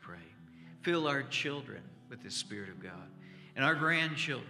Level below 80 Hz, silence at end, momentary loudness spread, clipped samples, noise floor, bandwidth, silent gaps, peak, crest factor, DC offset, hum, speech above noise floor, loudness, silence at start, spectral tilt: -78 dBFS; 0 s; 22 LU; under 0.1%; -54 dBFS; 14 kHz; none; -14 dBFS; 22 dB; under 0.1%; none; 20 dB; -33 LUFS; 0 s; -4 dB/octave